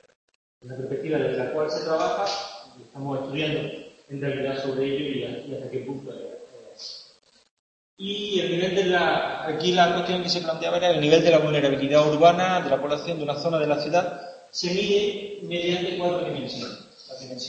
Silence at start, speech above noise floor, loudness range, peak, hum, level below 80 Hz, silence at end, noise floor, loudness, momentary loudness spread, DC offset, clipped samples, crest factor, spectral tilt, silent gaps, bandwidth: 0.65 s; 32 dB; 10 LU; -4 dBFS; none; -62 dBFS; 0 s; -56 dBFS; -24 LUFS; 19 LU; under 0.1%; under 0.1%; 22 dB; -5 dB/octave; 7.51-7.97 s; 8.6 kHz